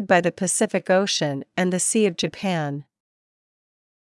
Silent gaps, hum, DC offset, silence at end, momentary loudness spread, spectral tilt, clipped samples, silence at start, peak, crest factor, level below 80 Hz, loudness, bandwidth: none; none; under 0.1%; 1.25 s; 7 LU; -4 dB/octave; under 0.1%; 0 s; -4 dBFS; 18 dB; -70 dBFS; -22 LUFS; 12 kHz